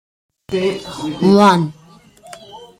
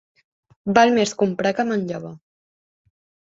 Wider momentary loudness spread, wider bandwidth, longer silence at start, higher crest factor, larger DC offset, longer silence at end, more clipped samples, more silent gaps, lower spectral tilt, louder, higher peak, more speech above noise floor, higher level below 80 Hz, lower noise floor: about the same, 19 LU vs 17 LU; first, 14.5 kHz vs 8 kHz; second, 0.5 s vs 0.65 s; about the same, 18 dB vs 22 dB; neither; second, 0.15 s vs 1.1 s; neither; neither; first, -6.5 dB/octave vs -5 dB/octave; first, -15 LUFS vs -20 LUFS; about the same, 0 dBFS vs -2 dBFS; second, 30 dB vs over 71 dB; first, -54 dBFS vs -62 dBFS; second, -44 dBFS vs under -90 dBFS